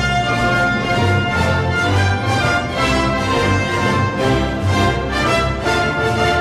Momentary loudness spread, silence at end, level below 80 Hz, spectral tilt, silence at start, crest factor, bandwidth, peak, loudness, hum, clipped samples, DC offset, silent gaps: 1 LU; 0 s; -30 dBFS; -5.5 dB/octave; 0 s; 12 dB; 13.5 kHz; -4 dBFS; -16 LUFS; none; under 0.1%; under 0.1%; none